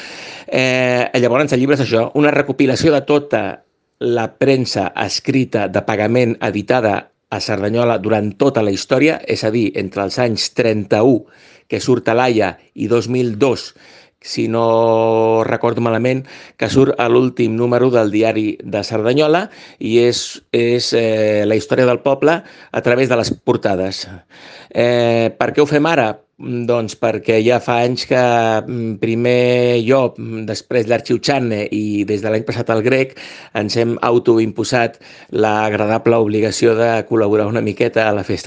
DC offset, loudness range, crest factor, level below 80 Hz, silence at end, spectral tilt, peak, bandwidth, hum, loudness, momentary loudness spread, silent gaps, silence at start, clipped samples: under 0.1%; 2 LU; 16 dB; -56 dBFS; 0 s; -5.5 dB/octave; 0 dBFS; 9.8 kHz; none; -16 LUFS; 8 LU; none; 0 s; under 0.1%